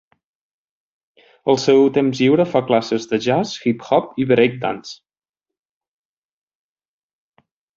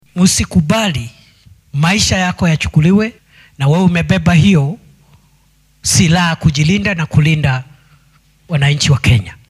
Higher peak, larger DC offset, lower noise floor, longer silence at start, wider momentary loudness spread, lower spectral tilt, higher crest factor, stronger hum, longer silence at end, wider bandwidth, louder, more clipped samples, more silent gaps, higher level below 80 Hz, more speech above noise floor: about the same, -2 dBFS vs 0 dBFS; neither; first, -87 dBFS vs -52 dBFS; first, 1.45 s vs 0.15 s; about the same, 11 LU vs 10 LU; about the same, -6 dB/octave vs -5 dB/octave; about the same, 18 dB vs 14 dB; neither; first, 2.8 s vs 0.15 s; second, 7.6 kHz vs 14 kHz; second, -17 LUFS vs -13 LUFS; neither; neither; second, -62 dBFS vs -34 dBFS; first, 70 dB vs 40 dB